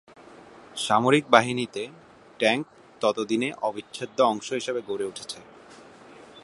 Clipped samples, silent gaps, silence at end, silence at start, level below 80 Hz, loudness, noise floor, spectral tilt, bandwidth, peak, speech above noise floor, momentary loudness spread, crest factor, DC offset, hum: under 0.1%; none; 0.05 s; 0.3 s; -70 dBFS; -25 LUFS; -49 dBFS; -4 dB/octave; 11.5 kHz; 0 dBFS; 24 dB; 17 LU; 26 dB; under 0.1%; none